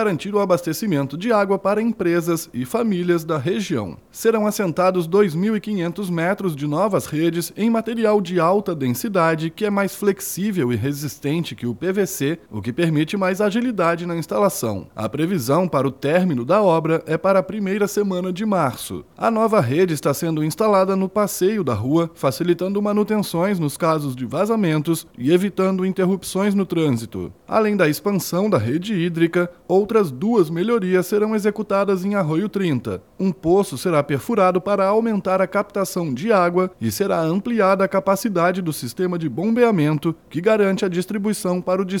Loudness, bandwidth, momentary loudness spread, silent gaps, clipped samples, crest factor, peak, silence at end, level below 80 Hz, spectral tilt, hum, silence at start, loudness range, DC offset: -20 LUFS; 18.5 kHz; 6 LU; none; under 0.1%; 16 dB; -4 dBFS; 0 s; -58 dBFS; -6 dB/octave; none; 0 s; 2 LU; under 0.1%